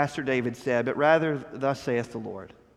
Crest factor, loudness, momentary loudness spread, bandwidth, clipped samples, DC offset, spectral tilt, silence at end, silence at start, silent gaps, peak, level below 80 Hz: 20 dB; -26 LUFS; 15 LU; 13 kHz; under 0.1%; under 0.1%; -6.5 dB/octave; 0.3 s; 0 s; none; -6 dBFS; -64 dBFS